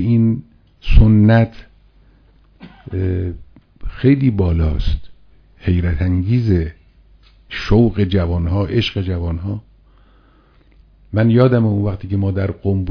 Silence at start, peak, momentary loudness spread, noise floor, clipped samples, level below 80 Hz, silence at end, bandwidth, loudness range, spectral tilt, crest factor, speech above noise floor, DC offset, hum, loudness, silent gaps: 0 s; 0 dBFS; 15 LU; -50 dBFS; 0.1%; -24 dBFS; 0 s; 5.4 kHz; 3 LU; -9.5 dB/octave; 16 dB; 36 dB; under 0.1%; none; -17 LUFS; none